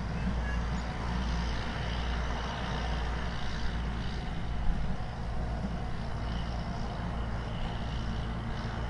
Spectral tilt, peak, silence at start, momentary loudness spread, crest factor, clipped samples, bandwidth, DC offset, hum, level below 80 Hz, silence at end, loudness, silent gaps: -6 dB/octave; -16 dBFS; 0 s; 3 LU; 16 dB; under 0.1%; 9.8 kHz; under 0.1%; none; -36 dBFS; 0 s; -35 LUFS; none